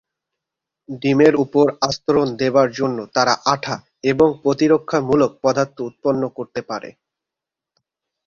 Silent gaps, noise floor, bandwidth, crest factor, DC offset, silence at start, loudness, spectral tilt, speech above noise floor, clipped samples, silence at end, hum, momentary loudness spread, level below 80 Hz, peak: none; -86 dBFS; 7.4 kHz; 20 dB; under 0.1%; 0.9 s; -18 LUFS; -5.5 dB/octave; 68 dB; under 0.1%; 1.35 s; none; 12 LU; -54 dBFS; 0 dBFS